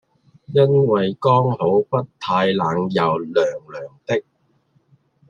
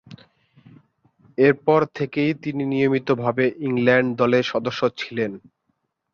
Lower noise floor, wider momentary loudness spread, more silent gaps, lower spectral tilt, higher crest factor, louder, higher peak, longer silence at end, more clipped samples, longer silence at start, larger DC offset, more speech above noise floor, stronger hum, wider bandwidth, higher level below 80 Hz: second, -62 dBFS vs -73 dBFS; about the same, 9 LU vs 8 LU; neither; about the same, -7.5 dB/octave vs -7 dB/octave; about the same, 18 dB vs 18 dB; about the same, -19 LUFS vs -21 LUFS; about the same, -2 dBFS vs -4 dBFS; first, 1.1 s vs 0.75 s; neither; first, 0.5 s vs 0.1 s; neither; second, 44 dB vs 52 dB; neither; about the same, 7.2 kHz vs 7 kHz; about the same, -62 dBFS vs -62 dBFS